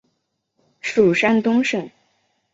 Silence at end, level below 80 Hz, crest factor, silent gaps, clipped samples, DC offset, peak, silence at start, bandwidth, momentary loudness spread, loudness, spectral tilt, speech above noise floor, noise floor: 0.65 s; -60 dBFS; 18 dB; none; under 0.1%; under 0.1%; -4 dBFS; 0.85 s; 8 kHz; 13 LU; -18 LUFS; -5.5 dB/octave; 56 dB; -73 dBFS